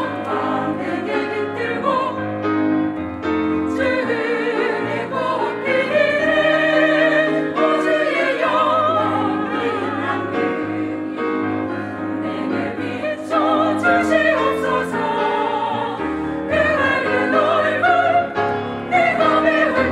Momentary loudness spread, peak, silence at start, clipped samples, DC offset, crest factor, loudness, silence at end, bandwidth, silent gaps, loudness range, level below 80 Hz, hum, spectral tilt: 8 LU; -4 dBFS; 0 s; under 0.1%; under 0.1%; 16 dB; -19 LUFS; 0 s; 11.5 kHz; none; 5 LU; -56 dBFS; none; -6 dB/octave